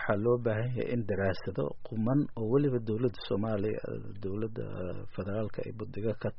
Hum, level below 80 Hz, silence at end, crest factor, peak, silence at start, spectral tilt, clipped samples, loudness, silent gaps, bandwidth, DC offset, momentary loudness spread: none; -56 dBFS; 0 s; 18 dB; -14 dBFS; 0 s; -7.5 dB/octave; under 0.1%; -33 LUFS; none; 5.6 kHz; under 0.1%; 11 LU